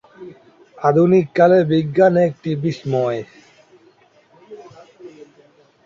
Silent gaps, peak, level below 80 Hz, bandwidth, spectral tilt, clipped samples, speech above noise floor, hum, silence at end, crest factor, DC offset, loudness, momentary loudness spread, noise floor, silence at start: none; -2 dBFS; -60 dBFS; 7.4 kHz; -8.5 dB/octave; under 0.1%; 38 dB; none; 0.75 s; 16 dB; under 0.1%; -16 LUFS; 9 LU; -53 dBFS; 0.2 s